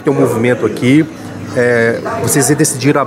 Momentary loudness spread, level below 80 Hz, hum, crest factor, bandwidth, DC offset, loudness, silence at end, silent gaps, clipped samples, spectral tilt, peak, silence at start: 7 LU; -50 dBFS; none; 12 dB; 16.5 kHz; under 0.1%; -12 LUFS; 0 s; none; under 0.1%; -5 dB/octave; 0 dBFS; 0 s